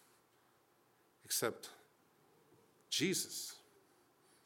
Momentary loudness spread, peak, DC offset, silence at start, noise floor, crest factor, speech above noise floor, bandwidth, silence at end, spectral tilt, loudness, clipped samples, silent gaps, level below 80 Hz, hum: 18 LU; -22 dBFS; under 0.1%; 1.25 s; -73 dBFS; 24 dB; 33 dB; 18 kHz; 0.9 s; -2.5 dB/octave; -39 LUFS; under 0.1%; none; under -90 dBFS; none